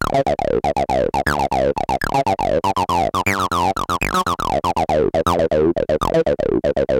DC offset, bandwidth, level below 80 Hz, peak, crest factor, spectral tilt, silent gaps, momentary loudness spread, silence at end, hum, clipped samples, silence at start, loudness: under 0.1%; 17 kHz; -36 dBFS; 0 dBFS; 18 dB; -5.5 dB/octave; none; 2 LU; 0 s; none; under 0.1%; 0 s; -18 LUFS